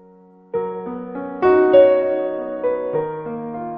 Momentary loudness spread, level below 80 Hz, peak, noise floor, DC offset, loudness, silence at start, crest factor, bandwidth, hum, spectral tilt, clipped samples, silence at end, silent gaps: 17 LU; -56 dBFS; -2 dBFS; -48 dBFS; under 0.1%; -18 LUFS; 0.55 s; 18 dB; 5.2 kHz; none; -5.5 dB/octave; under 0.1%; 0 s; none